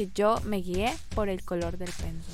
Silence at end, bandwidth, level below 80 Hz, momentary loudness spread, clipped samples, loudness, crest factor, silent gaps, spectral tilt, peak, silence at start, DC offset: 0 s; 16 kHz; -40 dBFS; 10 LU; under 0.1%; -30 LUFS; 18 dB; none; -5.5 dB/octave; -12 dBFS; 0 s; under 0.1%